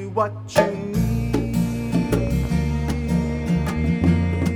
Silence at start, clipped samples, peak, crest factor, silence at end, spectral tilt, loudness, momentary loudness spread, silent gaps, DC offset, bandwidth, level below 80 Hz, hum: 0 s; under 0.1%; -4 dBFS; 18 dB; 0 s; -7.5 dB/octave; -22 LUFS; 4 LU; none; under 0.1%; 17 kHz; -30 dBFS; none